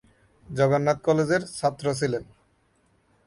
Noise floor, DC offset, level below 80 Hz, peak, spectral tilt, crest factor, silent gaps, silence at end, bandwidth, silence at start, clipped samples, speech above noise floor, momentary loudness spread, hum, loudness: -65 dBFS; under 0.1%; -58 dBFS; -8 dBFS; -6 dB/octave; 18 dB; none; 1.05 s; 11.5 kHz; 0.5 s; under 0.1%; 42 dB; 7 LU; none; -25 LUFS